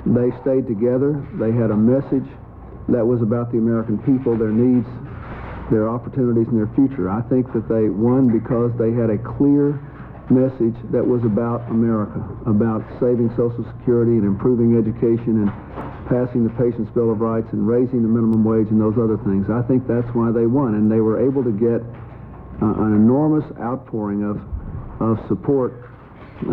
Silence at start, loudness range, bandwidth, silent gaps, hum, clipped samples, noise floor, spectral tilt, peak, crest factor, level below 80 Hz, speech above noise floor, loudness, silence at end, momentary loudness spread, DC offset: 0 s; 2 LU; 3.9 kHz; none; none; under 0.1%; -39 dBFS; -13 dB/octave; -6 dBFS; 12 dB; -42 dBFS; 22 dB; -19 LUFS; 0 s; 12 LU; under 0.1%